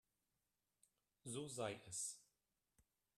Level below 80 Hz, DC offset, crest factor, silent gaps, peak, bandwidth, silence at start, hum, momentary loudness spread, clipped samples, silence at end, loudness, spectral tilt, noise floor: -86 dBFS; under 0.1%; 22 dB; none; -32 dBFS; 14 kHz; 1.25 s; none; 11 LU; under 0.1%; 0.4 s; -49 LUFS; -3 dB/octave; under -90 dBFS